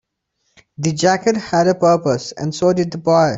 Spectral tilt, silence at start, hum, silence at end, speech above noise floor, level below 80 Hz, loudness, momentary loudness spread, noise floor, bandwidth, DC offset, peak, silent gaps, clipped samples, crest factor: -5.5 dB/octave; 0.8 s; none; 0 s; 54 dB; -54 dBFS; -17 LUFS; 7 LU; -70 dBFS; 8.2 kHz; under 0.1%; -2 dBFS; none; under 0.1%; 16 dB